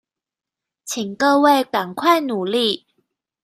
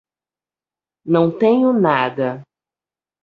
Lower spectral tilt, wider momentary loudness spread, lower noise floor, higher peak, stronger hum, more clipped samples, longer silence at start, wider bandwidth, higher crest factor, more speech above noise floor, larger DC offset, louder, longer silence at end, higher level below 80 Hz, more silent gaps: second, -3.5 dB/octave vs -9 dB/octave; about the same, 13 LU vs 14 LU; about the same, -88 dBFS vs under -90 dBFS; about the same, -4 dBFS vs -2 dBFS; neither; neither; second, 0.85 s vs 1.05 s; first, 15 kHz vs 5.2 kHz; about the same, 18 dB vs 18 dB; second, 70 dB vs over 74 dB; neither; about the same, -18 LUFS vs -17 LUFS; second, 0.65 s vs 0.8 s; second, -70 dBFS vs -62 dBFS; neither